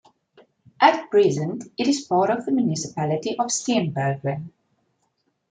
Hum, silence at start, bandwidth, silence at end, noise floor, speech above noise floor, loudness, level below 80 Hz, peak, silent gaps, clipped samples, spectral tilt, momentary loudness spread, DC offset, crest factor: none; 0.8 s; 9.4 kHz; 1 s; -71 dBFS; 49 dB; -22 LUFS; -66 dBFS; -2 dBFS; none; under 0.1%; -5 dB/octave; 10 LU; under 0.1%; 22 dB